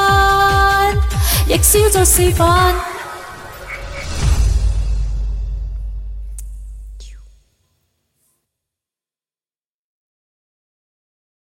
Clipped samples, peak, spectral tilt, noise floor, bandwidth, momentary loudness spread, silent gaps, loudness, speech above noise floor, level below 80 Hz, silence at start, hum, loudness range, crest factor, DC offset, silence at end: under 0.1%; 0 dBFS; -3.5 dB/octave; under -90 dBFS; 17 kHz; 21 LU; none; -14 LUFS; over 78 dB; -22 dBFS; 0 s; none; 20 LU; 18 dB; under 0.1%; 4.25 s